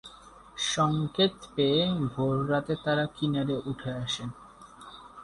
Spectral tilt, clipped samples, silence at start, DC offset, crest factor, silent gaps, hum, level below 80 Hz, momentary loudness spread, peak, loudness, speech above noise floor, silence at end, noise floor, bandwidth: -5 dB/octave; under 0.1%; 0.05 s; under 0.1%; 18 dB; none; none; -58 dBFS; 21 LU; -12 dBFS; -28 LUFS; 23 dB; 0 s; -51 dBFS; 11.5 kHz